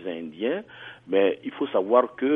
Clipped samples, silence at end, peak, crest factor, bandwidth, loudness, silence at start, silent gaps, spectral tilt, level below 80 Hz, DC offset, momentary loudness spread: under 0.1%; 0 s; -6 dBFS; 20 dB; 3.8 kHz; -25 LUFS; 0 s; none; -8 dB/octave; -72 dBFS; under 0.1%; 14 LU